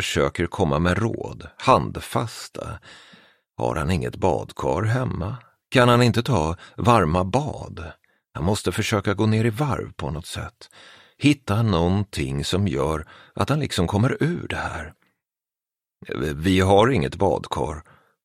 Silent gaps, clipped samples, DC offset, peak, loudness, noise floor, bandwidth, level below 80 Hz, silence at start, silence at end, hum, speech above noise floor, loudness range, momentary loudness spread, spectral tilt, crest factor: none; under 0.1%; under 0.1%; -2 dBFS; -22 LUFS; under -90 dBFS; 15 kHz; -42 dBFS; 0 s; 0.45 s; none; over 68 dB; 5 LU; 16 LU; -6 dB/octave; 22 dB